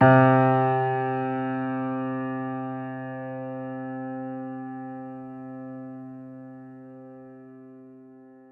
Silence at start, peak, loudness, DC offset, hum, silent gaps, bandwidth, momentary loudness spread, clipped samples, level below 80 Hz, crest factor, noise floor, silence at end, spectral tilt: 0 s; -6 dBFS; -26 LUFS; under 0.1%; none; none; 4.3 kHz; 24 LU; under 0.1%; -70 dBFS; 22 dB; -49 dBFS; 0.15 s; -11 dB/octave